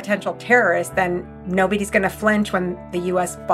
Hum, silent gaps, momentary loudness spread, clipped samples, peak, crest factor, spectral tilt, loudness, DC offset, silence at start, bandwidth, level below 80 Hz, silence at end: none; none; 9 LU; under 0.1%; -2 dBFS; 18 dB; -5 dB/octave; -20 LUFS; under 0.1%; 0 s; 14.5 kHz; -46 dBFS; 0 s